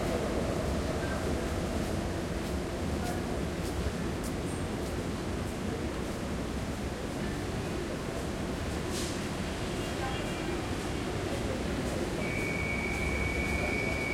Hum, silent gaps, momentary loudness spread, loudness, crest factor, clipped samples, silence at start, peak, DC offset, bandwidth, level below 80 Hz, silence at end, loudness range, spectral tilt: none; none; 4 LU; -33 LUFS; 14 dB; under 0.1%; 0 s; -18 dBFS; under 0.1%; 16.5 kHz; -42 dBFS; 0 s; 3 LU; -5 dB/octave